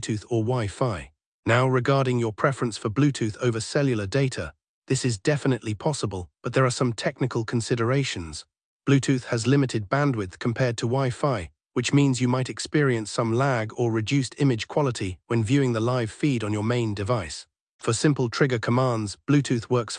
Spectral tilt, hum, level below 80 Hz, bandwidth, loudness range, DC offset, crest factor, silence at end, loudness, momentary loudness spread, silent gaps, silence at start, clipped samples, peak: -6 dB/octave; none; -56 dBFS; 10.5 kHz; 2 LU; under 0.1%; 18 dB; 0 s; -25 LUFS; 7 LU; 1.26-1.43 s, 4.69-4.82 s, 8.64-8.80 s, 17.61-17.79 s; 0 s; under 0.1%; -6 dBFS